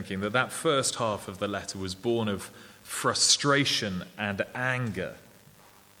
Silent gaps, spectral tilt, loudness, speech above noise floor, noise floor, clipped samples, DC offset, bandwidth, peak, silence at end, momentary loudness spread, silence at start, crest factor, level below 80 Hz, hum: none; -3 dB/octave; -27 LUFS; 27 dB; -56 dBFS; under 0.1%; under 0.1%; 20 kHz; -8 dBFS; 0.8 s; 15 LU; 0 s; 22 dB; -64 dBFS; none